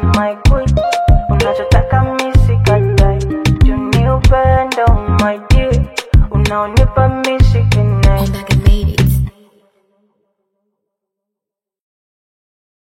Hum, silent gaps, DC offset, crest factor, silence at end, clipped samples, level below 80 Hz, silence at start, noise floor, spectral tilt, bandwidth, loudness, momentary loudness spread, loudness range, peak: none; none; under 0.1%; 12 dB; 3.55 s; under 0.1%; -16 dBFS; 0 s; -84 dBFS; -6.5 dB/octave; 16 kHz; -13 LUFS; 3 LU; 6 LU; 0 dBFS